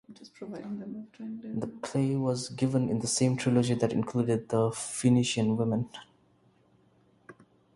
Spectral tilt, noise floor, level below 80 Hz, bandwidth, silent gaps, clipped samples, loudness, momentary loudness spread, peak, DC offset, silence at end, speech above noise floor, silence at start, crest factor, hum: -5.5 dB/octave; -65 dBFS; -64 dBFS; 11.5 kHz; none; under 0.1%; -29 LUFS; 16 LU; -12 dBFS; under 0.1%; 0.45 s; 36 dB; 0.1 s; 18 dB; none